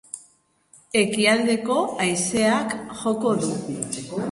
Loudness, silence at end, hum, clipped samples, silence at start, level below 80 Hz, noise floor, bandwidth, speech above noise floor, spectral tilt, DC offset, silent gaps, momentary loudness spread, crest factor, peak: -22 LUFS; 0 s; none; under 0.1%; 0.15 s; -60 dBFS; -60 dBFS; 11.5 kHz; 38 dB; -3.5 dB/octave; under 0.1%; none; 10 LU; 18 dB; -6 dBFS